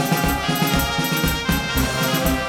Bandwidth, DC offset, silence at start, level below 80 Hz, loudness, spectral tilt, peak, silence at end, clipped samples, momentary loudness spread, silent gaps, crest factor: over 20 kHz; under 0.1%; 0 s; -30 dBFS; -20 LUFS; -4 dB/octave; -6 dBFS; 0 s; under 0.1%; 1 LU; none; 16 dB